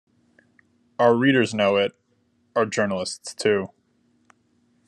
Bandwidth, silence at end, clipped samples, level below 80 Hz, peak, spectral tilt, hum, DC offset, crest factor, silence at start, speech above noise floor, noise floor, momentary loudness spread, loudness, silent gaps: 12 kHz; 1.2 s; under 0.1%; -72 dBFS; -6 dBFS; -5 dB/octave; none; under 0.1%; 20 dB; 1 s; 45 dB; -66 dBFS; 11 LU; -22 LUFS; none